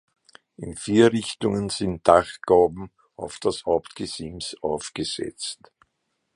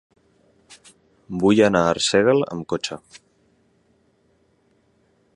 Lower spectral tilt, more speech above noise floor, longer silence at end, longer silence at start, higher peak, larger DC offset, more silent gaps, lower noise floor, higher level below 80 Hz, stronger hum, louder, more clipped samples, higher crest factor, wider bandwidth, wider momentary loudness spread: about the same, -5 dB/octave vs -4.5 dB/octave; first, 53 dB vs 44 dB; second, 0.8 s vs 2.2 s; about the same, 0.6 s vs 0.7 s; about the same, 0 dBFS vs -2 dBFS; neither; neither; first, -76 dBFS vs -63 dBFS; about the same, -52 dBFS vs -56 dBFS; neither; second, -23 LUFS vs -19 LUFS; neither; about the same, 24 dB vs 20 dB; about the same, 11.5 kHz vs 11.5 kHz; first, 19 LU vs 15 LU